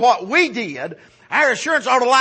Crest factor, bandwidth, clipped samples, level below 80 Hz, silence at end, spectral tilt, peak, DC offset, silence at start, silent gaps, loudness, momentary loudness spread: 14 dB; 8.8 kHz; under 0.1%; -70 dBFS; 0 s; -2.5 dB/octave; -2 dBFS; under 0.1%; 0 s; none; -17 LUFS; 13 LU